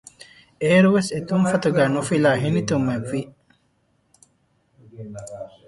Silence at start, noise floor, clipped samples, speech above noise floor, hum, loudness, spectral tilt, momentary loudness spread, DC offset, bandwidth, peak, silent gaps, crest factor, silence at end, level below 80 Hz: 0.6 s; -66 dBFS; under 0.1%; 46 dB; none; -20 LUFS; -6 dB/octave; 20 LU; under 0.1%; 11.5 kHz; -4 dBFS; none; 18 dB; 0.2 s; -58 dBFS